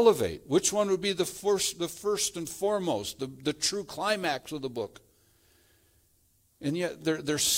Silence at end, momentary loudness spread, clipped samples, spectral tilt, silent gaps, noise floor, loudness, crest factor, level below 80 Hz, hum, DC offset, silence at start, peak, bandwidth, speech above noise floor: 0 s; 9 LU; under 0.1%; -3 dB/octave; none; -67 dBFS; -30 LUFS; 20 dB; -64 dBFS; none; under 0.1%; 0 s; -10 dBFS; 16.5 kHz; 38 dB